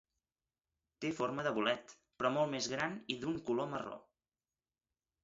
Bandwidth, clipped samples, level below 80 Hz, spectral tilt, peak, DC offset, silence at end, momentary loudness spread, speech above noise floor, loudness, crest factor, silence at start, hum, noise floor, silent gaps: 7.6 kHz; under 0.1%; -74 dBFS; -3 dB/octave; -18 dBFS; under 0.1%; 1.25 s; 8 LU; over 53 dB; -37 LUFS; 22 dB; 1 s; none; under -90 dBFS; none